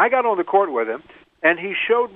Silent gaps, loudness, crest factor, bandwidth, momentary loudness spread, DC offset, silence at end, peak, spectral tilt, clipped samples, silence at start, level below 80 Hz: none; -20 LUFS; 16 dB; 3.9 kHz; 7 LU; under 0.1%; 0.05 s; -2 dBFS; -7.5 dB/octave; under 0.1%; 0 s; -66 dBFS